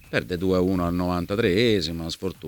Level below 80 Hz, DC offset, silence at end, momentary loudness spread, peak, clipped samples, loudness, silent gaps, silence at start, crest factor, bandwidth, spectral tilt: -44 dBFS; under 0.1%; 0 s; 8 LU; -8 dBFS; under 0.1%; -24 LUFS; none; 0.1 s; 16 dB; 19 kHz; -6 dB/octave